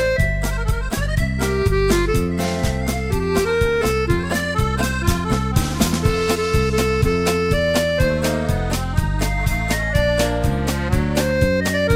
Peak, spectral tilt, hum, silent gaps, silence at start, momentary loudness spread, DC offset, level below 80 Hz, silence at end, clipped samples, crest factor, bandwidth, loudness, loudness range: -2 dBFS; -5.5 dB/octave; none; none; 0 s; 4 LU; under 0.1%; -26 dBFS; 0 s; under 0.1%; 16 dB; 16.5 kHz; -20 LUFS; 1 LU